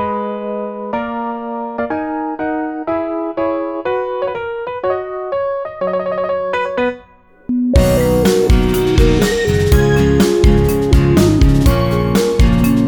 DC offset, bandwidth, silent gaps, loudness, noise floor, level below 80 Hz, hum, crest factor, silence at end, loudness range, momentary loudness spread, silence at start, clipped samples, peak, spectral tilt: under 0.1%; over 20 kHz; none; -15 LUFS; -44 dBFS; -20 dBFS; none; 14 dB; 0 s; 8 LU; 10 LU; 0 s; under 0.1%; 0 dBFS; -6.5 dB/octave